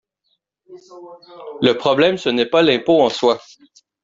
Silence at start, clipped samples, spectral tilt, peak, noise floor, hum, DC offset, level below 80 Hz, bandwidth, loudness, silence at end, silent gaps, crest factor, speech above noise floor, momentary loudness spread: 0.7 s; under 0.1%; -5 dB/octave; -2 dBFS; -70 dBFS; none; under 0.1%; -60 dBFS; 7.8 kHz; -16 LUFS; 0.65 s; none; 16 dB; 52 dB; 10 LU